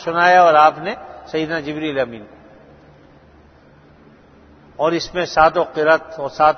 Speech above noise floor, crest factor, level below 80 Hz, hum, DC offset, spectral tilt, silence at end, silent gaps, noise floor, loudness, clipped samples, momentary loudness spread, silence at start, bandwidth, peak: 31 dB; 18 dB; -50 dBFS; none; under 0.1%; -5 dB/octave; 0 s; none; -48 dBFS; -16 LUFS; under 0.1%; 16 LU; 0 s; 6.6 kHz; 0 dBFS